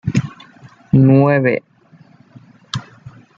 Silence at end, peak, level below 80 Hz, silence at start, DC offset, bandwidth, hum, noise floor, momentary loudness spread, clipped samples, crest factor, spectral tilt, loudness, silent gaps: 0.3 s; -2 dBFS; -50 dBFS; 0.05 s; under 0.1%; 7.6 kHz; none; -48 dBFS; 17 LU; under 0.1%; 16 dB; -8 dB/octave; -15 LUFS; none